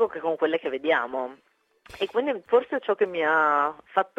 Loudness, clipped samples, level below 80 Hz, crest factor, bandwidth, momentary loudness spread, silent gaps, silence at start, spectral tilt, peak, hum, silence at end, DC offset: -25 LUFS; under 0.1%; -68 dBFS; 18 dB; 8 kHz; 9 LU; none; 0 s; -5 dB/octave; -8 dBFS; none; 0.1 s; under 0.1%